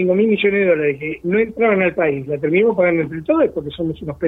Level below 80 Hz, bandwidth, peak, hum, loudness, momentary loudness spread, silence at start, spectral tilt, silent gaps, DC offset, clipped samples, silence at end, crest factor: -48 dBFS; 4 kHz; -2 dBFS; none; -17 LUFS; 9 LU; 0 s; -9 dB/octave; none; under 0.1%; under 0.1%; 0 s; 14 dB